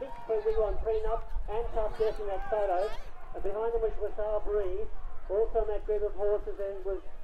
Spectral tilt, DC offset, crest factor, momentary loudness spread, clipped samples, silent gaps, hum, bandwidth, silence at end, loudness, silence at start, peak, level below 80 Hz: -7.5 dB/octave; under 0.1%; 12 dB; 8 LU; under 0.1%; none; none; 5.4 kHz; 0 s; -33 LUFS; 0 s; -16 dBFS; -38 dBFS